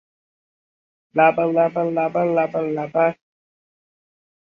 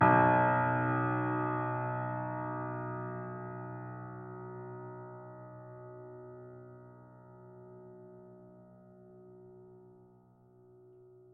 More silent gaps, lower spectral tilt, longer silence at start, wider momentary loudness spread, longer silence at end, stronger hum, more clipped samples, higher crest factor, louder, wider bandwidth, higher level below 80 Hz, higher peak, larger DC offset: neither; first, -9 dB/octave vs -7.5 dB/octave; first, 1.15 s vs 0 s; second, 6 LU vs 26 LU; about the same, 1.35 s vs 1.45 s; neither; neither; about the same, 20 dB vs 22 dB; first, -20 LUFS vs -33 LUFS; first, 5.2 kHz vs 3.5 kHz; first, -68 dBFS vs -74 dBFS; first, -2 dBFS vs -14 dBFS; neither